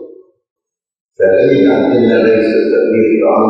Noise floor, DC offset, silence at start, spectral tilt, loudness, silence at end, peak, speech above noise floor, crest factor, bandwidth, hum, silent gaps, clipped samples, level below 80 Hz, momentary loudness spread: -35 dBFS; under 0.1%; 0 s; -8.5 dB/octave; -10 LUFS; 0 s; 0 dBFS; 26 dB; 12 dB; 6 kHz; none; 0.51-0.56 s, 1.01-1.09 s; under 0.1%; -52 dBFS; 2 LU